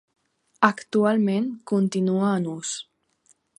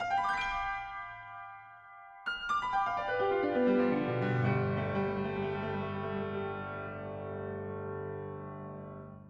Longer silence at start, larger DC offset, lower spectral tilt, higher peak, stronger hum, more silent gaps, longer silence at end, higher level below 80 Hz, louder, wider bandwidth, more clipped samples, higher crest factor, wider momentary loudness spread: first, 0.6 s vs 0 s; neither; second, -5.5 dB/octave vs -7.5 dB/octave; first, -2 dBFS vs -18 dBFS; neither; neither; first, 0.75 s vs 0 s; second, -72 dBFS vs -60 dBFS; first, -23 LUFS vs -34 LUFS; first, 11 kHz vs 8.8 kHz; neither; first, 22 dB vs 16 dB; second, 9 LU vs 16 LU